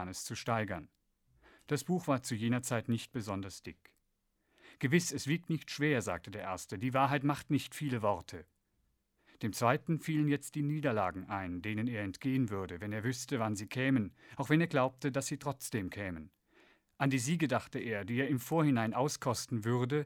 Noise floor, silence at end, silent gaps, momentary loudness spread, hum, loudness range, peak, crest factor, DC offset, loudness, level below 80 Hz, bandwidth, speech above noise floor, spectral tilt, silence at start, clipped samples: -79 dBFS; 0 s; none; 10 LU; none; 3 LU; -12 dBFS; 22 dB; under 0.1%; -35 LUFS; -68 dBFS; 18 kHz; 45 dB; -5.5 dB/octave; 0 s; under 0.1%